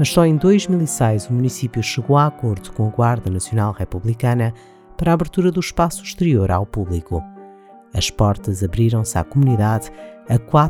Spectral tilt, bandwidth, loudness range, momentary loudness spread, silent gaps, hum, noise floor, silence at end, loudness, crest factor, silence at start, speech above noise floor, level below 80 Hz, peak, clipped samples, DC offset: -6.5 dB/octave; 16 kHz; 2 LU; 9 LU; none; none; -43 dBFS; 0 s; -19 LUFS; 18 dB; 0 s; 26 dB; -38 dBFS; 0 dBFS; under 0.1%; under 0.1%